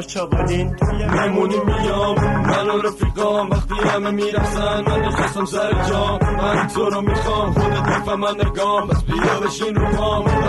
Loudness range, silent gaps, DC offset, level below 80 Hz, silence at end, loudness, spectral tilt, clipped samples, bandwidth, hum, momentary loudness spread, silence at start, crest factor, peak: 1 LU; none; under 0.1%; -26 dBFS; 0 s; -19 LUFS; -6 dB/octave; under 0.1%; 12 kHz; none; 3 LU; 0 s; 14 dB; -4 dBFS